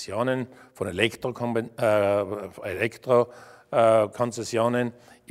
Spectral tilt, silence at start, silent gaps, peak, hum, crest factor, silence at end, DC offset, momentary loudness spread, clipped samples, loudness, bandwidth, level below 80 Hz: -5.5 dB/octave; 0 s; none; -4 dBFS; none; 22 dB; 0.4 s; under 0.1%; 12 LU; under 0.1%; -25 LUFS; 15 kHz; -64 dBFS